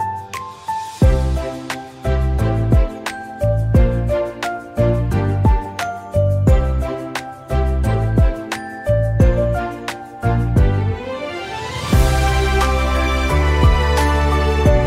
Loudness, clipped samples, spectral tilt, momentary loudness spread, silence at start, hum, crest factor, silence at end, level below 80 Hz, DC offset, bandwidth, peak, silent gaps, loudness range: -18 LUFS; under 0.1%; -6.5 dB/octave; 11 LU; 0 s; none; 14 dB; 0 s; -20 dBFS; under 0.1%; 15.5 kHz; -2 dBFS; none; 2 LU